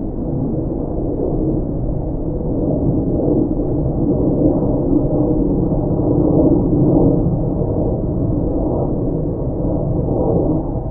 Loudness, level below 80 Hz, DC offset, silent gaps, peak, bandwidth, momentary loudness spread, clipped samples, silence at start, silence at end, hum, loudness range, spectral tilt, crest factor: -18 LUFS; -24 dBFS; under 0.1%; none; 0 dBFS; 1.7 kHz; 7 LU; under 0.1%; 0 s; 0 s; none; 4 LU; -18 dB/octave; 16 dB